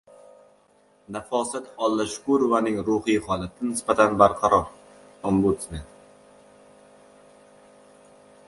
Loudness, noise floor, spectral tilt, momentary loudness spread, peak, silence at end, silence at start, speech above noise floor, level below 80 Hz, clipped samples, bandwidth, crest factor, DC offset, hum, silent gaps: -23 LUFS; -60 dBFS; -5.5 dB/octave; 16 LU; -2 dBFS; 2.65 s; 1.1 s; 37 dB; -50 dBFS; under 0.1%; 11.5 kHz; 24 dB; under 0.1%; none; none